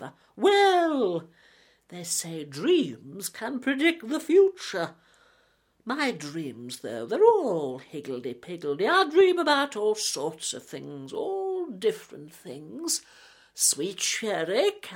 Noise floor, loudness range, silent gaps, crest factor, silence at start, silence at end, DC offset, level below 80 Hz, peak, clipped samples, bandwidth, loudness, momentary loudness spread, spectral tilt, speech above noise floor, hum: -66 dBFS; 5 LU; none; 20 dB; 0 s; 0 s; under 0.1%; -76 dBFS; -8 dBFS; under 0.1%; 17 kHz; -26 LUFS; 17 LU; -2.5 dB/octave; 40 dB; none